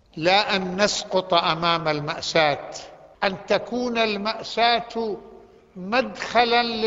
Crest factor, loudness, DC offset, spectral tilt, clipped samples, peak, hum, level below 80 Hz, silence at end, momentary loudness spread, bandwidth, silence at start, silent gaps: 20 dB; -22 LUFS; under 0.1%; -3.5 dB/octave; under 0.1%; -2 dBFS; none; -56 dBFS; 0 s; 10 LU; 8 kHz; 0.15 s; none